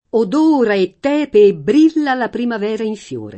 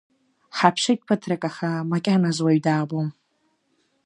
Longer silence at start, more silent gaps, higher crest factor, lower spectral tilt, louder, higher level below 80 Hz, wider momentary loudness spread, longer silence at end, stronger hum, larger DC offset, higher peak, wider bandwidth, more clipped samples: second, 0.15 s vs 0.55 s; neither; second, 14 dB vs 22 dB; about the same, -6.5 dB/octave vs -5.5 dB/octave; first, -15 LUFS vs -23 LUFS; first, -56 dBFS vs -72 dBFS; about the same, 9 LU vs 8 LU; second, 0 s vs 0.95 s; neither; neither; about the same, 0 dBFS vs -2 dBFS; second, 8.6 kHz vs 11 kHz; neither